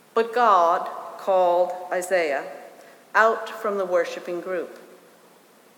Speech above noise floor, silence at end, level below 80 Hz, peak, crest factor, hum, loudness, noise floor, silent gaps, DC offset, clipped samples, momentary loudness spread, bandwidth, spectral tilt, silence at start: 32 dB; 0.95 s; -86 dBFS; -4 dBFS; 20 dB; none; -23 LUFS; -54 dBFS; none; under 0.1%; under 0.1%; 13 LU; 18.5 kHz; -3.5 dB/octave; 0.15 s